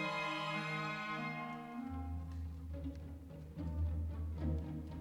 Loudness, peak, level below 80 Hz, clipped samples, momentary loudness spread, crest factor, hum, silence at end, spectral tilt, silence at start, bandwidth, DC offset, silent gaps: -42 LUFS; -28 dBFS; -48 dBFS; under 0.1%; 8 LU; 14 dB; none; 0 s; -6.5 dB/octave; 0 s; 11 kHz; under 0.1%; none